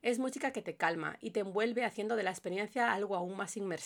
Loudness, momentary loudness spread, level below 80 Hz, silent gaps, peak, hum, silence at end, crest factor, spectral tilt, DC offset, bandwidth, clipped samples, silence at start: -35 LUFS; 6 LU; -84 dBFS; none; -14 dBFS; none; 0 s; 20 dB; -4 dB/octave; under 0.1%; 18.5 kHz; under 0.1%; 0.05 s